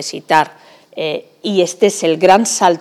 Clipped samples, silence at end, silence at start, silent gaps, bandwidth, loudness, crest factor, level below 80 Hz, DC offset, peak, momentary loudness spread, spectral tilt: under 0.1%; 0 s; 0 s; none; 15.5 kHz; -14 LUFS; 14 dB; -60 dBFS; under 0.1%; 0 dBFS; 13 LU; -3.5 dB/octave